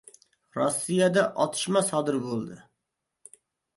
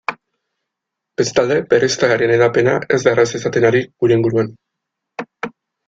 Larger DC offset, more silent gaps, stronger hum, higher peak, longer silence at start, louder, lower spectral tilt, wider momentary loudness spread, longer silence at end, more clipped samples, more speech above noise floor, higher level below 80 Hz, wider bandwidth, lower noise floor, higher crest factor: neither; neither; neither; second, -10 dBFS vs 0 dBFS; first, 0.55 s vs 0.1 s; second, -26 LUFS vs -15 LUFS; about the same, -4.5 dB/octave vs -5 dB/octave; second, 11 LU vs 16 LU; first, 1.15 s vs 0.4 s; neither; second, 57 dB vs 65 dB; second, -72 dBFS vs -54 dBFS; first, 12 kHz vs 7.8 kHz; about the same, -83 dBFS vs -80 dBFS; about the same, 18 dB vs 16 dB